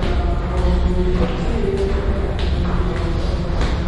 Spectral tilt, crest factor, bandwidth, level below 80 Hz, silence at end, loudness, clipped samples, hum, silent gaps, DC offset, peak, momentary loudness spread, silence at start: -7.5 dB/octave; 12 dB; 10.5 kHz; -20 dBFS; 0 s; -21 LUFS; under 0.1%; none; none; under 0.1%; -6 dBFS; 3 LU; 0 s